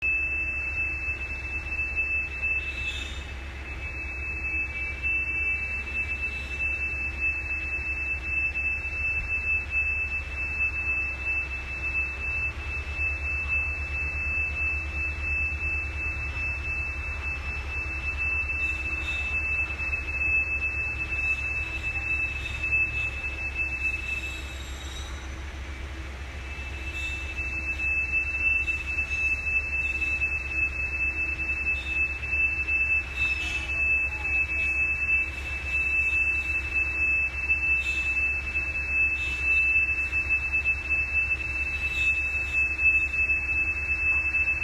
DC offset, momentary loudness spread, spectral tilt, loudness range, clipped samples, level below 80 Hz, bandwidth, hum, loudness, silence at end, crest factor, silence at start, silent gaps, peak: under 0.1%; 8 LU; -4 dB/octave; 6 LU; under 0.1%; -38 dBFS; 13 kHz; none; -25 LUFS; 0 s; 14 dB; 0 s; none; -14 dBFS